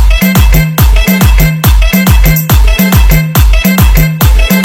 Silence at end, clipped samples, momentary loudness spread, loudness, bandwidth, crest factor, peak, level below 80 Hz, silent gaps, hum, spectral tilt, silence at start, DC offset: 0 s; 7%; 1 LU; -7 LUFS; over 20 kHz; 4 dB; 0 dBFS; -8 dBFS; none; none; -5 dB/octave; 0 s; under 0.1%